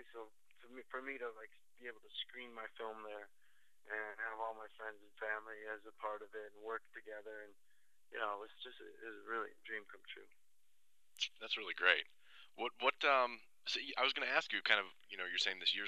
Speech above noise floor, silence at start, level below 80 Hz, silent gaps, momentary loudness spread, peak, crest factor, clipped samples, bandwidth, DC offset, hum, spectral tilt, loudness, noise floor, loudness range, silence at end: 41 dB; 0 s; under -90 dBFS; none; 20 LU; -14 dBFS; 30 dB; under 0.1%; 13 kHz; under 0.1%; none; -0.5 dB/octave; -40 LUFS; -83 dBFS; 12 LU; 0 s